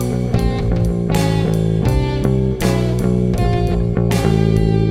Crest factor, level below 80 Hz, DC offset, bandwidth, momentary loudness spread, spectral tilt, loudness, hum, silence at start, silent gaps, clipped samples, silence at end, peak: 14 dB; -24 dBFS; under 0.1%; 15.5 kHz; 3 LU; -7.5 dB/octave; -17 LUFS; none; 0 s; none; under 0.1%; 0 s; -2 dBFS